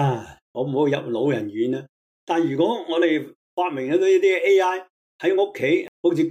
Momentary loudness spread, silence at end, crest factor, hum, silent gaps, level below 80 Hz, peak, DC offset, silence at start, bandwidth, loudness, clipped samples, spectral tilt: 10 LU; 0 s; 14 dB; none; 0.42-0.54 s, 1.89-2.27 s, 3.35-3.57 s, 4.90-5.19 s, 5.88-6.04 s; -70 dBFS; -8 dBFS; under 0.1%; 0 s; 9.2 kHz; -22 LUFS; under 0.1%; -6.5 dB/octave